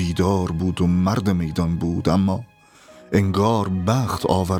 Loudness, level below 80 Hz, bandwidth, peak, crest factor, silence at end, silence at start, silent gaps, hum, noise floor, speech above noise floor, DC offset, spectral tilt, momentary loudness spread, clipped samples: -21 LUFS; -40 dBFS; 16 kHz; -4 dBFS; 18 dB; 0 s; 0 s; none; none; -48 dBFS; 29 dB; under 0.1%; -7 dB/octave; 4 LU; under 0.1%